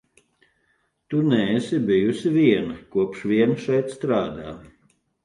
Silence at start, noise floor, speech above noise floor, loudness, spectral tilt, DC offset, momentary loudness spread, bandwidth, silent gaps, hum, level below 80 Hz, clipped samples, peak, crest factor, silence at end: 1.1 s; -68 dBFS; 47 dB; -22 LUFS; -7.5 dB/octave; under 0.1%; 9 LU; 11.5 kHz; none; none; -56 dBFS; under 0.1%; -4 dBFS; 18 dB; 0.6 s